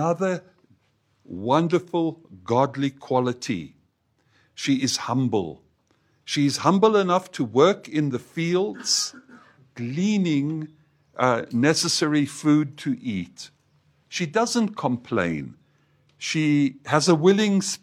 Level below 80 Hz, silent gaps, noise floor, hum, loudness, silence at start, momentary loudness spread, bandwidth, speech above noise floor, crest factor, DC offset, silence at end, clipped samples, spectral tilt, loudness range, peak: -66 dBFS; none; -67 dBFS; none; -23 LUFS; 0 s; 14 LU; 15 kHz; 45 dB; 22 dB; under 0.1%; 0.05 s; under 0.1%; -5 dB/octave; 5 LU; -2 dBFS